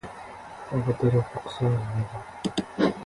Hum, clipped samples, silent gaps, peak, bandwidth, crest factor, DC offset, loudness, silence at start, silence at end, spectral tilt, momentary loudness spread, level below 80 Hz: none; under 0.1%; none; -10 dBFS; 11.5 kHz; 18 dB; under 0.1%; -28 LUFS; 0.05 s; 0 s; -7.5 dB/octave; 17 LU; -52 dBFS